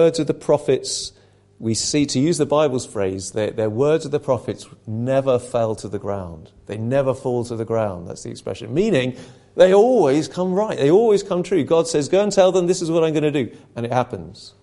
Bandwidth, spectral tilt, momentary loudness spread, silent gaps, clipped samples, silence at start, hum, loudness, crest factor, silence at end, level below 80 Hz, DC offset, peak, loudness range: 11.5 kHz; -5.5 dB/octave; 15 LU; none; under 0.1%; 0 s; none; -19 LUFS; 18 dB; 0.15 s; -52 dBFS; under 0.1%; 0 dBFS; 6 LU